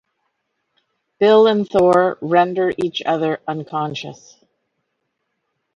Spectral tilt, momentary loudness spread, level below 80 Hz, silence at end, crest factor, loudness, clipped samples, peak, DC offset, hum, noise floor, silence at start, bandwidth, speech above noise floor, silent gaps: -6.5 dB/octave; 12 LU; -60 dBFS; 1.6 s; 18 dB; -17 LUFS; under 0.1%; -2 dBFS; under 0.1%; none; -74 dBFS; 1.2 s; 9.6 kHz; 57 dB; none